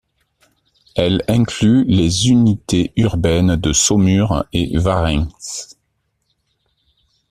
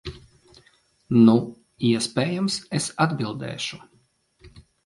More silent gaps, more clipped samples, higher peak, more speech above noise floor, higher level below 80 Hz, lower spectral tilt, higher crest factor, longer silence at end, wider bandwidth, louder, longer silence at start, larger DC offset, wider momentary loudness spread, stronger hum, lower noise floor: neither; neither; first, 0 dBFS vs -4 dBFS; first, 54 dB vs 42 dB; first, -34 dBFS vs -56 dBFS; about the same, -5 dB/octave vs -5.5 dB/octave; about the same, 16 dB vs 20 dB; first, 1.65 s vs 0.35 s; first, 13.5 kHz vs 11.5 kHz; first, -15 LUFS vs -23 LUFS; first, 0.95 s vs 0.05 s; neither; second, 11 LU vs 15 LU; neither; first, -68 dBFS vs -64 dBFS